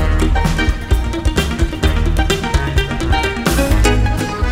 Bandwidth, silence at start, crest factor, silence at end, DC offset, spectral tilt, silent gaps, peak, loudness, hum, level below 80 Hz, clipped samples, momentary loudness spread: 16.5 kHz; 0 s; 14 dB; 0 s; under 0.1%; -5 dB/octave; none; 0 dBFS; -16 LUFS; none; -16 dBFS; under 0.1%; 4 LU